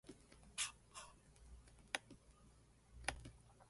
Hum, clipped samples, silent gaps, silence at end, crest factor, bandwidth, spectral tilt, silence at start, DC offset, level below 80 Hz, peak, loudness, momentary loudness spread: none; under 0.1%; none; 0 s; 32 dB; 11.5 kHz; -1 dB/octave; 0.05 s; under 0.1%; -66 dBFS; -22 dBFS; -49 LUFS; 22 LU